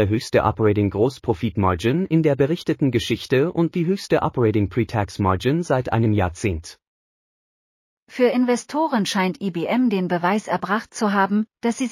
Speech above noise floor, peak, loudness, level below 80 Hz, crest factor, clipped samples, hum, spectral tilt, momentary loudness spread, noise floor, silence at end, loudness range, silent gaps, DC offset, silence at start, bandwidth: over 70 dB; -6 dBFS; -21 LUFS; -46 dBFS; 16 dB; under 0.1%; none; -6.5 dB/octave; 5 LU; under -90 dBFS; 0 s; 3 LU; 6.87-8.07 s; under 0.1%; 0 s; 15 kHz